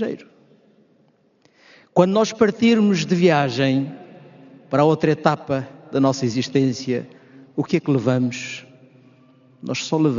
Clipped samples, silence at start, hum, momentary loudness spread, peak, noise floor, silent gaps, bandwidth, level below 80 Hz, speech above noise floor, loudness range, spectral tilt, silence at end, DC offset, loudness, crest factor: under 0.1%; 0 s; none; 14 LU; -2 dBFS; -59 dBFS; none; 7.4 kHz; -64 dBFS; 41 dB; 5 LU; -5.5 dB/octave; 0 s; under 0.1%; -20 LUFS; 20 dB